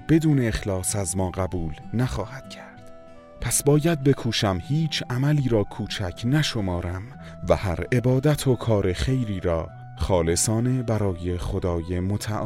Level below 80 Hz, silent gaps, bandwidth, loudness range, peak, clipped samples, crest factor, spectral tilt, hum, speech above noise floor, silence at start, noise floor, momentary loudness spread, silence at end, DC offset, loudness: -40 dBFS; none; 16 kHz; 2 LU; -6 dBFS; under 0.1%; 18 dB; -5.5 dB/octave; none; 21 dB; 0 s; -44 dBFS; 12 LU; 0 s; under 0.1%; -24 LUFS